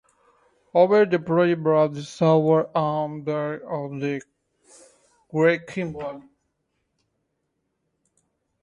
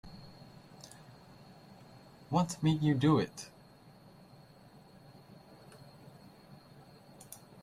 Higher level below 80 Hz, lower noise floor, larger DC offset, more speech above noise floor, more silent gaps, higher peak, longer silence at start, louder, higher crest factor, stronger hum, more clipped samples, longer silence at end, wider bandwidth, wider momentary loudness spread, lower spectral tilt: about the same, -66 dBFS vs -66 dBFS; first, -76 dBFS vs -58 dBFS; neither; first, 54 dB vs 28 dB; neither; first, -6 dBFS vs -16 dBFS; first, 0.75 s vs 0.05 s; first, -22 LUFS vs -31 LUFS; about the same, 20 dB vs 22 dB; neither; neither; first, 2.4 s vs 0.3 s; second, 10.5 kHz vs 15 kHz; second, 13 LU vs 28 LU; about the same, -7.5 dB/octave vs -6.5 dB/octave